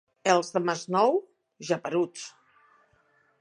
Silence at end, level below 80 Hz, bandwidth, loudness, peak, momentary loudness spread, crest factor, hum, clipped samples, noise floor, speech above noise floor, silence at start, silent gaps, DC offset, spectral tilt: 1.1 s; -82 dBFS; 10.5 kHz; -27 LUFS; -6 dBFS; 17 LU; 22 dB; none; under 0.1%; -66 dBFS; 40 dB; 0.25 s; none; under 0.1%; -4.5 dB/octave